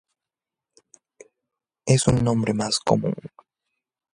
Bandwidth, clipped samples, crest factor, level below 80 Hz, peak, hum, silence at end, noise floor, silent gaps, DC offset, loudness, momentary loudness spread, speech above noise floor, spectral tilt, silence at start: 11.5 kHz; under 0.1%; 22 dB; -48 dBFS; -2 dBFS; none; 0.85 s; -89 dBFS; none; under 0.1%; -22 LUFS; 13 LU; 67 dB; -5.5 dB/octave; 1.85 s